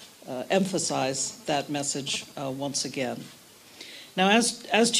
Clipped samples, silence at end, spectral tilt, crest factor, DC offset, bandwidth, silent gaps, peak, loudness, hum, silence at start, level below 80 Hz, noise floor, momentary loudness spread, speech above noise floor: under 0.1%; 0 s; -3 dB/octave; 20 dB; under 0.1%; 15.5 kHz; none; -8 dBFS; -27 LUFS; none; 0 s; -72 dBFS; -48 dBFS; 17 LU; 21 dB